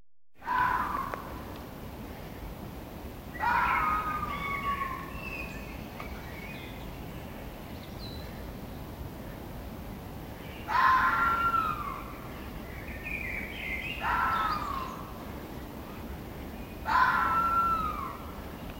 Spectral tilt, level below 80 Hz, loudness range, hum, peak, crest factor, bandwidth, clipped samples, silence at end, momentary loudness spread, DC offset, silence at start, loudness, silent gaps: -5 dB/octave; -46 dBFS; 12 LU; none; -12 dBFS; 20 dB; 16 kHz; under 0.1%; 0 s; 17 LU; under 0.1%; 0 s; -31 LUFS; none